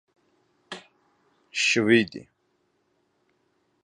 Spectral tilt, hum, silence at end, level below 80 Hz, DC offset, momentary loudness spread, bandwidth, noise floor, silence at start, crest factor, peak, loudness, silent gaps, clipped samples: -3.5 dB/octave; none; 1.65 s; -70 dBFS; under 0.1%; 22 LU; 11 kHz; -71 dBFS; 0.7 s; 22 dB; -6 dBFS; -22 LUFS; none; under 0.1%